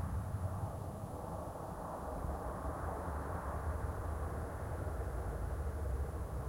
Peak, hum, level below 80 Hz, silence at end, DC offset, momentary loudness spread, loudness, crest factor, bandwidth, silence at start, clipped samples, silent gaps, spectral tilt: -28 dBFS; none; -44 dBFS; 0 s; under 0.1%; 4 LU; -42 LUFS; 12 dB; 16.5 kHz; 0 s; under 0.1%; none; -7.5 dB/octave